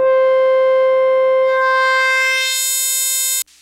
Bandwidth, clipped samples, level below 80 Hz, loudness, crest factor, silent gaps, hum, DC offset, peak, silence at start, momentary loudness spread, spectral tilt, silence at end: 16 kHz; under 0.1%; -70 dBFS; -14 LUFS; 8 dB; none; none; under 0.1%; -6 dBFS; 0 s; 2 LU; 3 dB/octave; 0.2 s